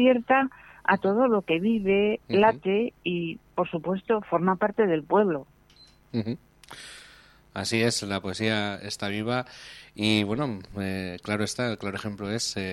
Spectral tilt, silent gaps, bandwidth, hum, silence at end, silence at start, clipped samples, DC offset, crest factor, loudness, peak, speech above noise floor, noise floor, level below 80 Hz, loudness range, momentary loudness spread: -5 dB/octave; none; 14 kHz; none; 0 s; 0 s; under 0.1%; under 0.1%; 20 dB; -26 LUFS; -6 dBFS; 30 dB; -56 dBFS; -60 dBFS; 5 LU; 12 LU